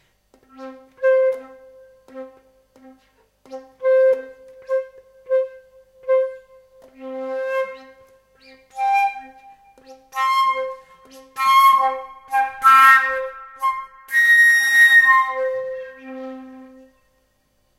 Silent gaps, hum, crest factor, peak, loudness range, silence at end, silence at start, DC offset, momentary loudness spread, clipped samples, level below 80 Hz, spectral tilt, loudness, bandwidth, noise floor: none; none; 20 dB; 0 dBFS; 12 LU; 1.15 s; 0.6 s; under 0.1%; 26 LU; under 0.1%; -66 dBFS; 0 dB/octave; -16 LUFS; 16 kHz; -64 dBFS